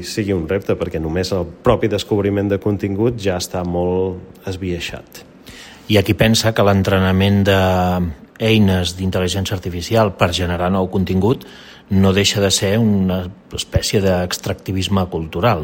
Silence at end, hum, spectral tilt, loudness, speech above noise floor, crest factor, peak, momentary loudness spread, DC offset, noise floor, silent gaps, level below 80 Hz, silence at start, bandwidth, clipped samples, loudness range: 0 s; none; -5.5 dB/octave; -17 LUFS; 22 dB; 16 dB; 0 dBFS; 10 LU; under 0.1%; -39 dBFS; none; -40 dBFS; 0 s; 16.5 kHz; under 0.1%; 5 LU